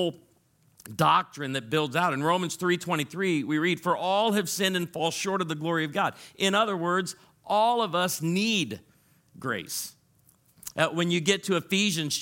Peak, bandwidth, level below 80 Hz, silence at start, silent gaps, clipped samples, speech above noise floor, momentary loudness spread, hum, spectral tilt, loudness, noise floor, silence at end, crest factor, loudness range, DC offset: -6 dBFS; 17 kHz; -72 dBFS; 0 s; none; under 0.1%; 38 dB; 9 LU; none; -4 dB/octave; -26 LUFS; -64 dBFS; 0 s; 22 dB; 3 LU; under 0.1%